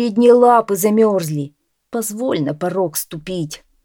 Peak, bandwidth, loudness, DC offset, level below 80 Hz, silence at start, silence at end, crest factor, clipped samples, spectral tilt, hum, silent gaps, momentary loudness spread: 0 dBFS; 19 kHz; -16 LUFS; under 0.1%; -58 dBFS; 0 s; 0.3 s; 16 dB; under 0.1%; -5.5 dB/octave; none; none; 15 LU